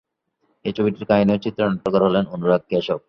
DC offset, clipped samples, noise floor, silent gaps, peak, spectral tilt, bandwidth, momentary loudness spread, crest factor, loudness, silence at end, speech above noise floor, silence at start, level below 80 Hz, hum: under 0.1%; under 0.1%; -69 dBFS; none; -4 dBFS; -8.5 dB/octave; 6.2 kHz; 5 LU; 18 dB; -20 LUFS; 0.1 s; 49 dB; 0.65 s; -54 dBFS; none